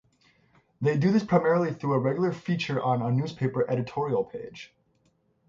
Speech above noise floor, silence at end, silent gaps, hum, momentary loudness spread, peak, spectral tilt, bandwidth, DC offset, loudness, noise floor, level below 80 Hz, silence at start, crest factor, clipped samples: 43 dB; 0.85 s; none; none; 7 LU; -8 dBFS; -8 dB/octave; 7.6 kHz; under 0.1%; -27 LUFS; -69 dBFS; -66 dBFS; 0.8 s; 18 dB; under 0.1%